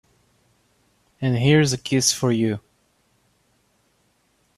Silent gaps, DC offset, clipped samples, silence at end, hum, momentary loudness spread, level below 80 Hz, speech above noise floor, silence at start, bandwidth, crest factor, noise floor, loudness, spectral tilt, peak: none; under 0.1%; under 0.1%; 2 s; none; 9 LU; -58 dBFS; 46 dB; 1.2 s; 14 kHz; 20 dB; -65 dBFS; -20 LUFS; -4.5 dB/octave; -6 dBFS